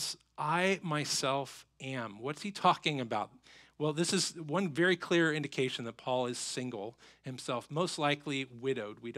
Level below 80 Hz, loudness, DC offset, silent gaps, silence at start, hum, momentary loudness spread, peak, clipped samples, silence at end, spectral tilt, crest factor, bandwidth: -78 dBFS; -33 LUFS; under 0.1%; none; 0 s; none; 12 LU; -12 dBFS; under 0.1%; 0 s; -4 dB/octave; 22 dB; 15 kHz